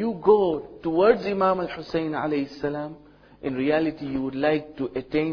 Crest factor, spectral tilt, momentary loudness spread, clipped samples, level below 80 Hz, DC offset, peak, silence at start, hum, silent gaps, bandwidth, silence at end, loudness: 18 dB; -8 dB/octave; 11 LU; under 0.1%; -54 dBFS; under 0.1%; -6 dBFS; 0 s; none; none; 5.4 kHz; 0 s; -24 LUFS